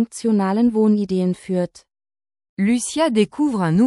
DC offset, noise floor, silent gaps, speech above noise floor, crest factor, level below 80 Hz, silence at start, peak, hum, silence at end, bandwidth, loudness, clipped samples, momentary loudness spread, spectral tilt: under 0.1%; under -90 dBFS; 2.49-2.57 s; over 72 dB; 14 dB; -58 dBFS; 0 s; -6 dBFS; none; 0 s; 12 kHz; -19 LUFS; under 0.1%; 7 LU; -6 dB/octave